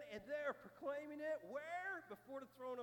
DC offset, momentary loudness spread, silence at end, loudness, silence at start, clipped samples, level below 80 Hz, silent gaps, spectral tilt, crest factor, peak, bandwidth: under 0.1%; 7 LU; 0 s; -48 LUFS; 0 s; under 0.1%; -84 dBFS; none; -5 dB/octave; 16 dB; -32 dBFS; 19 kHz